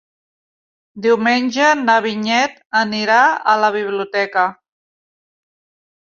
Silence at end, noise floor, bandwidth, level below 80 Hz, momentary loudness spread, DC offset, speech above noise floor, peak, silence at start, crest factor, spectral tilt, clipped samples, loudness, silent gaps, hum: 1.5 s; under -90 dBFS; 7.6 kHz; -68 dBFS; 7 LU; under 0.1%; over 74 dB; -2 dBFS; 0.95 s; 16 dB; -3.5 dB/octave; under 0.1%; -16 LUFS; 2.66-2.70 s; none